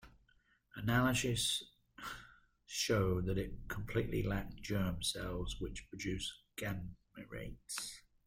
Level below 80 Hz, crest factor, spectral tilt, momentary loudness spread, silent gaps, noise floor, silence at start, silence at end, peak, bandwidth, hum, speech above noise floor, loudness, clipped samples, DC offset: -52 dBFS; 18 dB; -4.5 dB/octave; 15 LU; none; -72 dBFS; 0 s; 0.25 s; -20 dBFS; 16 kHz; none; 35 dB; -39 LUFS; under 0.1%; under 0.1%